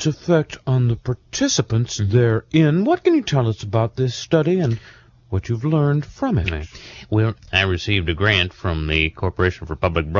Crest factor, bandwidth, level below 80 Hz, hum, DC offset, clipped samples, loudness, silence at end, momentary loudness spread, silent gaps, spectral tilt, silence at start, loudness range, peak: 16 dB; 7.4 kHz; -38 dBFS; none; under 0.1%; under 0.1%; -20 LUFS; 0 s; 8 LU; none; -5.5 dB/octave; 0 s; 3 LU; -2 dBFS